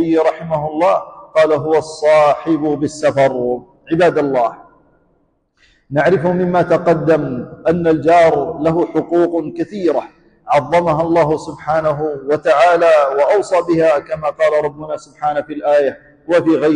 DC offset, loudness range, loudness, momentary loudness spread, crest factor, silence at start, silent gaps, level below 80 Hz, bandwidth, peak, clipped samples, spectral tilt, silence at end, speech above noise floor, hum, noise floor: under 0.1%; 3 LU; -15 LUFS; 9 LU; 12 dB; 0 s; none; -50 dBFS; 10 kHz; -4 dBFS; under 0.1%; -6.5 dB/octave; 0 s; 46 dB; none; -60 dBFS